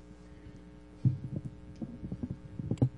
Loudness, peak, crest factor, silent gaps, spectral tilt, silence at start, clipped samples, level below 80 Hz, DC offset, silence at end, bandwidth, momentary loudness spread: -38 LUFS; -12 dBFS; 24 dB; none; -10 dB/octave; 0 s; under 0.1%; -54 dBFS; under 0.1%; 0 s; 8.2 kHz; 20 LU